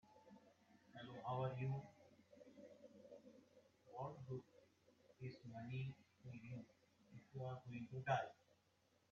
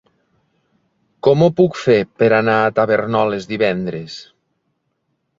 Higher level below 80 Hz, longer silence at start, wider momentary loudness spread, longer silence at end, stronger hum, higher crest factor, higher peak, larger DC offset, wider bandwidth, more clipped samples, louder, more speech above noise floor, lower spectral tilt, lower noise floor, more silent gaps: second, -82 dBFS vs -56 dBFS; second, 0.05 s vs 1.25 s; first, 22 LU vs 12 LU; second, 0.8 s vs 1.15 s; neither; first, 24 dB vs 16 dB; second, -28 dBFS vs -2 dBFS; neither; about the same, 7 kHz vs 7.6 kHz; neither; second, -50 LUFS vs -16 LUFS; second, 33 dB vs 54 dB; about the same, -6 dB/octave vs -7 dB/octave; first, -80 dBFS vs -70 dBFS; neither